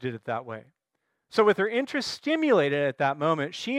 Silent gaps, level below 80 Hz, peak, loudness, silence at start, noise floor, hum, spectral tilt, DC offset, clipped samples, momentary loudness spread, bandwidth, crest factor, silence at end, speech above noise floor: none; -74 dBFS; -8 dBFS; -26 LUFS; 0 s; -79 dBFS; none; -5.5 dB/octave; under 0.1%; under 0.1%; 11 LU; 12.5 kHz; 18 dB; 0 s; 54 dB